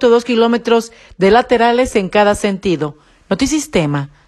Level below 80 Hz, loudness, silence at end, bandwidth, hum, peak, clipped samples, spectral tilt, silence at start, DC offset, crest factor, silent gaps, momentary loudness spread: -40 dBFS; -14 LUFS; 0.2 s; 12.5 kHz; none; 0 dBFS; under 0.1%; -5 dB/octave; 0 s; under 0.1%; 14 dB; none; 8 LU